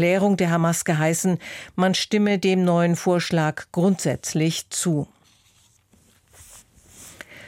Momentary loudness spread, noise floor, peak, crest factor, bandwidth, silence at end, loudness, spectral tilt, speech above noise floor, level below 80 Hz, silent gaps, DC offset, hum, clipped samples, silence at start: 7 LU; -59 dBFS; -8 dBFS; 14 dB; 16.5 kHz; 0 s; -22 LUFS; -5 dB/octave; 38 dB; -60 dBFS; none; under 0.1%; none; under 0.1%; 0 s